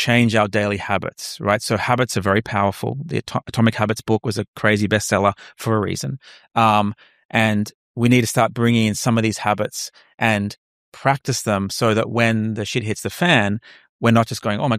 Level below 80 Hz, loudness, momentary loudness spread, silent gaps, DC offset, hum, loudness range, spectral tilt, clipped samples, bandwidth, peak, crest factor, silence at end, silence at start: -54 dBFS; -20 LUFS; 9 LU; 4.48-4.53 s, 7.25-7.29 s, 7.74-7.95 s, 10.58-10.92 s, 13.89-13.99 s; under 0.1%; none; 2 LU; -5 dB/octave; under 0.1%; 15.5 kHz; -2 dBFS; 18 dB; 0 s; 0 s